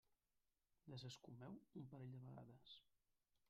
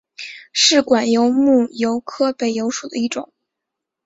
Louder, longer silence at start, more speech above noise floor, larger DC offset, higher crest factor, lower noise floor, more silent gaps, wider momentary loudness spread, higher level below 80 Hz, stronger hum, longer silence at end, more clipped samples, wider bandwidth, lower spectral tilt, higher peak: second, -60 LUFS vs -17 LUFS; about the same, 0.1 s vs 0.2 s; second, 31 dB vs 65 dB; neither; about the same, 16 dB vs 16 dB; first, -89 dBFS vs -82 dBFS; neither; second, 7 LU vs 11 LU; second, -88 dBFS vs -62 dBFS; neither; second, 0.6 s vs 0.85 s; neither; second, 7.2 kHz vs 8 kHz; first, -6 dB/octave vs -2.5 dB/octave; second, -44 dBFS vs -2 dBFS